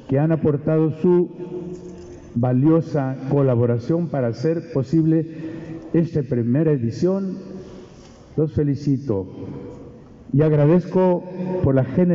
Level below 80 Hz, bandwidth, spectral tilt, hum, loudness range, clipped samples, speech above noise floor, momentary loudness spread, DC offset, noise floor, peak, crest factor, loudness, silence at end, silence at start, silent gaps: -50 dBFS; 7.2 kHz; -10 dB/octave; none; 3 LU; under 0.1%; 25 dB; 17 LU; under 0.1%; -43 dBFS; -6 dBFS; 14 dB; -20 LUFS; 0 s; 0 s; none